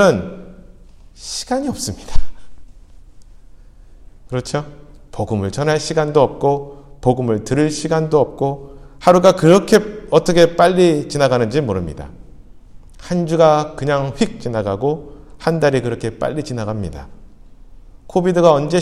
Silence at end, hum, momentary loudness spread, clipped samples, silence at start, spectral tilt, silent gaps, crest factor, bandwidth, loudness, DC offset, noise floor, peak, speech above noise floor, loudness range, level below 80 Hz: 0 s; none; 16 LU; under 0.1%; 0 s; -6 dB/octave; none; 16 dB; 14 kHz; -17 LUFS; under 0.1%; -41 dBFS; 0 dBFS; 26 dB; 14 LU; -36 dBFS